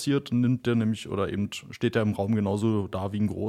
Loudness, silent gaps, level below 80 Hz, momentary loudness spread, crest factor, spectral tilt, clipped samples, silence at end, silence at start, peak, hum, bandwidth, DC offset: -27 LUFS; none; -58 dBFS; 5 LU; 16 dB; -7 dB/octave; under 0.1%; 0 s; 0 s; -10 dBFS; none; 13.5 kHz; under 0.1%